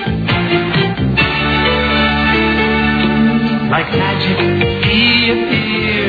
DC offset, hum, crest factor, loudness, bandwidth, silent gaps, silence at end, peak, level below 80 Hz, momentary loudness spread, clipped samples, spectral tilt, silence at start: under 0.1%; none; 14 dB; -13 LUFS; 5 kHz; none; 0 s; 0 dBFS; -30 dBFS; 4 LU; under 0.1%; -7.5 dB/octave; 0 s